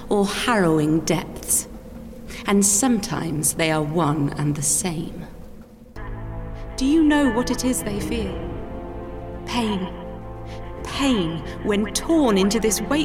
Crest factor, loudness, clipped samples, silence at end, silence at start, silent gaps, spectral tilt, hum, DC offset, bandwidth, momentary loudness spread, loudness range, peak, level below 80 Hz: 16 dB; -21 LUFS; under 0.1%; 0 s; 0 s; none; -4 dB/octave; none; under 0.1%; 17 kHz; 18 LU; 6 LU; -6 dBFS; -38 dBFS